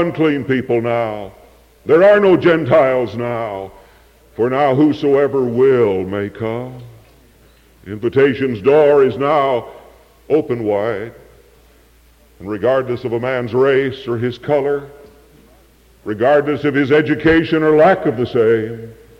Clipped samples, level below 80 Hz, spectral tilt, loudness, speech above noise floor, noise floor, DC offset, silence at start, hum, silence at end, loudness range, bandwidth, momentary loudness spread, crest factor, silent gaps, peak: under 0.1%; -48 dBFS; -8 dB/octave; -15 LUFS; 35 dB; -49 dBFS; under 0.1%; 0 s; none; 0.25 s; 6 LU; 8.4 kHz; 16 LU; 12 dB; none; -4 dBFS